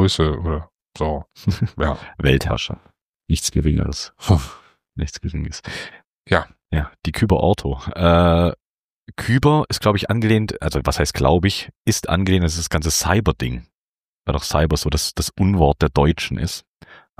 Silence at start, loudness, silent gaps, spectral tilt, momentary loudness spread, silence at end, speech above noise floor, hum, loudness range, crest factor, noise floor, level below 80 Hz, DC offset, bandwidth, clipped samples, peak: 0 s; -20 LUFS; 0.74-0.79 s, 3.01-3.14 s, 6.05-6.24 s, 8.65-9.06 s, 11.77-11.85 s, 13.75-13.93 s, 14.04-14.22 s, 16.67-16.80 s; -5.5 dB/octave; 12 LU; 0.25 s; over 71 dB; none; 5 LU; 18 dB; under -90 dBFS; -30 dBFS; under 0.1%; 15.5 kHz; under 0.1%; -2 dBFS